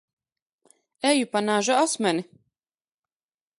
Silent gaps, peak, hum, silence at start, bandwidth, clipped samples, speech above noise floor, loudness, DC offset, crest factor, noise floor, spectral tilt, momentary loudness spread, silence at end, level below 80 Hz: none; -8 dBFS; none; 1.05 s; 11.5 kHz; under 0.1%; over 67 dB; -23 LUFS; under 0.1%; 20 dB; under -90 dBFS; -3 dB/octave; 5 LU; 1.35 s; -80 dBFS